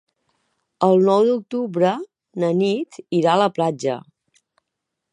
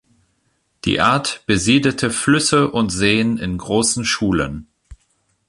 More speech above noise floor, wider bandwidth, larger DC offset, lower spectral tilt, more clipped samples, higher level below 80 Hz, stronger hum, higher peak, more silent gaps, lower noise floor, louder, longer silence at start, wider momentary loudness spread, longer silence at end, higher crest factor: first, 62 dB vs 49 dB; second, 10 kHz vs 11.5 kHz; neither; first, -6.5 dB/octave vs -4 dB/octave; neither; second, -74 dBFS vs -42 dBFS; neither; about the same, -2 dBFS vs 0 dBFS; neither; first, -80 dBFS vs -66 dBFS; second, -20 LUFS vs -17 LUFS; about the same, 0.8 s vs 0.85 s; first, 10 LU vs 7 LU; first, 1.1 s vs 0.55 s; about the same, 18 dB vs 18 dB